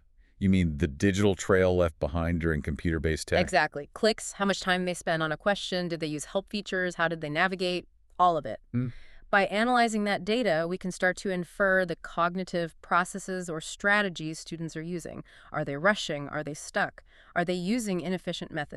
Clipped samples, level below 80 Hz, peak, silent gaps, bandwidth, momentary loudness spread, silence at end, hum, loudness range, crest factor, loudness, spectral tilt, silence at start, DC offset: under 0.1%; -48 dBFS; -8 dBFS; none; 13 kHz; 10 LU; 0 s; none; 4 LU; 20 dB; -28 LUFS; -5 dB/octave; 0.4 s; under 0.1%